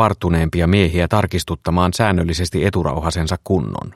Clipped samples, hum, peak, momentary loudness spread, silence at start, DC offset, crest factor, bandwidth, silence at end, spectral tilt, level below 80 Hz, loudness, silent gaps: under 0.1%; none; 0 dBFS; 5 LU; 0 s; under 0.1%; 16 dB; 13.5 kHz; 0.05 s; -6 dB/octave; -30 dBFS; -18 LUFS; none